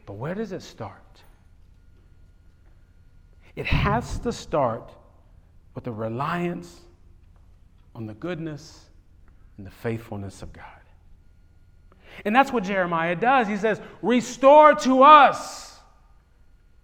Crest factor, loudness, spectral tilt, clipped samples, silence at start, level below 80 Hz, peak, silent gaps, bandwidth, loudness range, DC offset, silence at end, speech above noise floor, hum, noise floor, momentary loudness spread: 22 dB; -20 LUFS; -5.5 dB/octave; under 0.1%; 0.05 s; -44 dBFS; -2 dBFS; none; 15.5 kHz; 21 LU; under 0.1%; 1.15 s; 33 dB; none; -55 dBFS; 26 LU